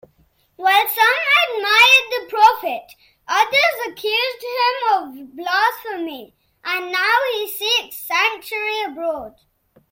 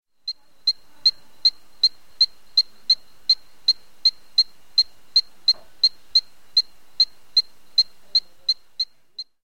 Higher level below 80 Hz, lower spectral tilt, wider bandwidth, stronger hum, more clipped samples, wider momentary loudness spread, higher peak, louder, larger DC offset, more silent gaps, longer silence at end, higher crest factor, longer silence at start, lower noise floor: about the same, -64 dBFS vs -66 dBFS; first, 0 dB/octave vs 2 dB/octave; about the same, 16.5 kHz vs 16.5 kHz; neither; neither; first, 14 LU vs 6 LU; first, -2 dBFS vs -8 dBFS; first, -17 LUFS vs -20 LUFS; second, under 0.1% vs 1%; neither; first, 0.6 s vs 0.2 s; about the same, 18 dB vs 16 dB; first, 0.6 s vs 0.25 s; first, -59 dBFS vs -41 dBFS